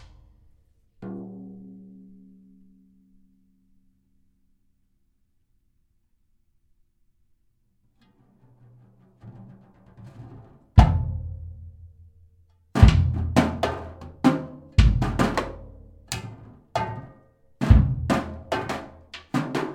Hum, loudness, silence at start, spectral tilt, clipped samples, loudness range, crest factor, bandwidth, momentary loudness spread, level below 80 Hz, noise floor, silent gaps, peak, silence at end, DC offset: none; -23 LUFS; 1 s; -7 dB/octave; under 0.1%; 22 LU; 26 dB; 12 kHz; 26 LU; -30 dBFS; -67 dBFS; none; 0 dBFS; 0 s; under 0.1%